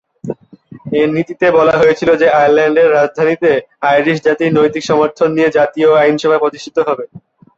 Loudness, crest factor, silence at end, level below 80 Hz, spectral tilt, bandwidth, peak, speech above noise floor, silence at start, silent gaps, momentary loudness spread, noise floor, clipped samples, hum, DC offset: -12 LUFS; 12 dB; 0.4 s; -52 dBFS; -6 dB/octave; 7.8 kHz; 0 dBFS; 27 dB; 0.25 s; none; 9 LU; -38 dBFS; under 0.1%; none; under 0.1%